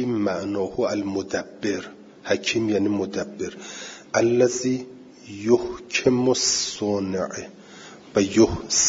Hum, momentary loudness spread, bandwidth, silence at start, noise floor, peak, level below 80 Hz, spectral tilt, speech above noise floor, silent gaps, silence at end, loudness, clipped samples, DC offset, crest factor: none; 17 LU; 7.8 kHz; 0 s; -44 dBFS; -6 dBFS; -54 dBFS; -3.5 dB/octave; 21 dB; none; 0 s; -23 LUFS; under 0.1%; under 0.1%; 18 dB